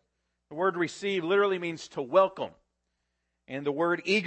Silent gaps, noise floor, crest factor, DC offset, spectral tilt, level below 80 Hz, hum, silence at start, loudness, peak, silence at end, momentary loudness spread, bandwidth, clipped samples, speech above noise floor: none; -80 dBFS; 20 dB; under 0.1%; -5 dB/octave; -78 dBFS; none; 0.5 s; -28 LUFS; -10 dBFS; 0 s; 14 LU; 8.8 kHz; under 0.1%; 52 dB